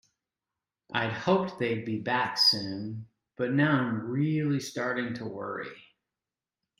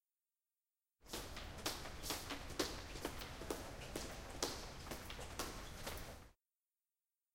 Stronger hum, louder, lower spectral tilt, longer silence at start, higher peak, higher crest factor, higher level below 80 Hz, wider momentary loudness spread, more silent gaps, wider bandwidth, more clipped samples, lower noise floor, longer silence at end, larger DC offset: neither; first, -28 LUFS vs -47 LUFS; first, -5 dB/octave vs -3 dB/octave; about the same, 0.9 s vs 1 s; first, -10 dBFS vs -18 dBFS; second, 20 dB vs 32 dB; second, -70 dBFS vs -58 dBFS; first, 14 LU vs 7 LU; neither; about the same, 16 kHz vs 16.5 kHz; neither; about the same, under -90 dBFS vs under -90 dBFS; about the same, 1 s vs 1 s; neither